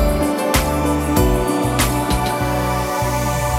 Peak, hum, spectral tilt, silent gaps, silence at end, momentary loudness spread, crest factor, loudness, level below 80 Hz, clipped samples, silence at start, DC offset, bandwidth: -2 dBFS; none; -5 dB/octave; none; 0 s; 3 LU; 16 dB; -18 LUFS; -24 dBFS; under 0.1%; 0 s; under 0.1%; 17.5 kHz